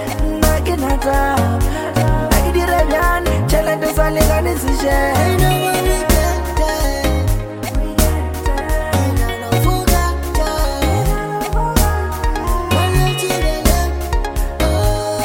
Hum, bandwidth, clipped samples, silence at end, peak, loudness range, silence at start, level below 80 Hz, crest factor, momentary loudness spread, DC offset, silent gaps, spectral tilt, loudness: none; 17 kHz; under 0.1%; 0 s; 0 dBFS; 2 LU; 0 s; -20 dBFS; 16 dB; 5 LU; under 0.1%; none; -5 dB/octave; -17 LUFS